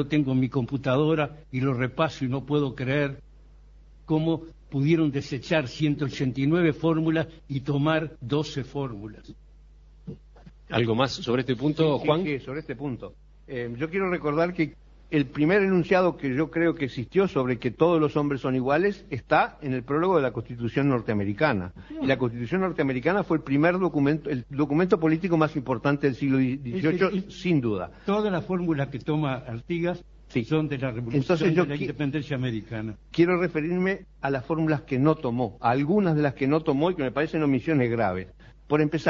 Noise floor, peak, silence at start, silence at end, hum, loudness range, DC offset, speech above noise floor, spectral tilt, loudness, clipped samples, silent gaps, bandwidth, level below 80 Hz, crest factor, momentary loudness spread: -51 dBFS; -4 dBFS; 0 s; 0 s; none; 4 LU; under 0.1%; 26 dB; -8 dB/octave; -26 LUFS; under 0.1%; none; 7.4 kHz; -52 dBFS; 20 dB; 9 LU